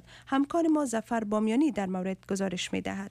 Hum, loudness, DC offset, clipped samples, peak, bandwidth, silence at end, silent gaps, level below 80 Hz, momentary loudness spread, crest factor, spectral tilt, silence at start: none; -29 LUFS; under 0.1%; under 0.1%; -16 dBFS; 13.5 kHz; 0 s; none; -62 dBFS; 6 LU; 14 dB; -5.5 dB/octave; 0.1 s